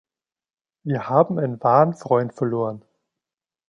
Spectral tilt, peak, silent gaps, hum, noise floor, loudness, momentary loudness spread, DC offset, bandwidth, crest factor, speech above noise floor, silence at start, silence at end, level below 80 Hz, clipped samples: -9 dB/octave; -2 dBFS; none; none; under -90 dBFS; -21 LUFS; 11 LU; under 0.1%; 8.8 kHz; 20 dB; over 70 dB; 0.85 s; 0.9 s; -68 dBFS; under 0.1%